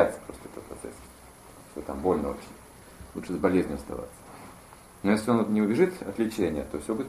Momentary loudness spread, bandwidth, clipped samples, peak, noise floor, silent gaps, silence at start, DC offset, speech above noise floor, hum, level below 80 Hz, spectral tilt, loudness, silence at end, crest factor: 24 LU; 14.5 kHz; under 0.1%; -6 dBFS; -50 dBFS; none; 0 s; under 0.1%; 23 dB; none; -50 dBFS; -6.5 dB/octave; -28 LUFS; 0 s; 22 dB